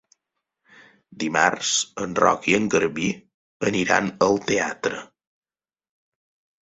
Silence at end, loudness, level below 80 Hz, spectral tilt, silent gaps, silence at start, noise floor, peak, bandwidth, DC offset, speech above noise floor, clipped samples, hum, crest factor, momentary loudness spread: 1.6 s; -22 LUFS; -58 dBFS; -3 dB/octave; 3.34-3.60 s; 1.15 s; under -90 dBFS; -2 dBFS; 8.4 kHz; under 0.1%; over 68 dB; under 0.1%; none; 22 dB; 9 LU